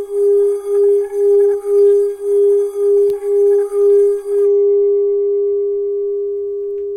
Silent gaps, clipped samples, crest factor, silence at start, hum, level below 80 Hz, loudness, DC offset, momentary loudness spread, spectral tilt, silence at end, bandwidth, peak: none; under 0.1%; 8 dB; 0 s; none; -58 dBFS; -14 LUFS; under 0.1%; 7 LU; -5.5 dB/octave; 0 s; 10 kHz; -6 dBFS